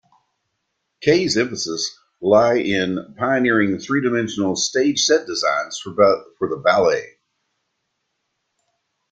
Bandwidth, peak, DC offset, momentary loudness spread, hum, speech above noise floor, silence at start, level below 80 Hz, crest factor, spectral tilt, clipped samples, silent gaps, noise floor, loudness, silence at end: 9.6 kHz; -2 dBFS; under 0.1%; 9 LU; none; 56 dB; 1 s; -60 dBFS; 18 dB; -3.5 dB/octave; under 0.1%; none; -75 dBFS; -19 LUFS; 2.05 s